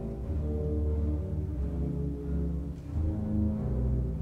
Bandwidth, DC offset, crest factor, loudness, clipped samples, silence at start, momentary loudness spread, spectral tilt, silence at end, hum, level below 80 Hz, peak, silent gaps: 2.7 kHz; under 0.1%; 12 dB; -32 LUFS; under 0.1%; 0 s; 4 LU; -11 dB/octave; 0 s; none; -34 dBFS; -20 dBFS; none